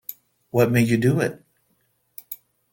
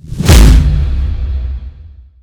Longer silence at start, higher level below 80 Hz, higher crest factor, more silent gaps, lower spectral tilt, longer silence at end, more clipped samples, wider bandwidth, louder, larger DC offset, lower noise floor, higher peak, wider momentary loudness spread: about the same, 0.1 s vs 0.05 s; second, -58 dBFS vs -10 dBFS; first, 20 dB vs 10 dB; neither; first, -7 dB/octave vs -5.5 dB/octave; about the same, 0.4 s vs 0.35 s; second, under 0.1% vs 3%; about the same, 17 kHz vs 18 kHz; second, -21 LUFS vs -11 LUFS; neither; first, -68 dBFS vs -35 dBFS; second, -4 dBFS vs 0 dBFS; first, 21 LU vs 16 LU